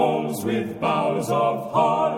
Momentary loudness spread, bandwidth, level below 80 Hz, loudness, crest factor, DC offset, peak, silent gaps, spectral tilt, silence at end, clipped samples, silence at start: 5 LU; 17.5 kHz; -62 dBFS; -23 LUFS; 14 dB; under 0.1%; -8 dBFS; none; -6 dB/octave; 0 s; under 0.1%; 0 s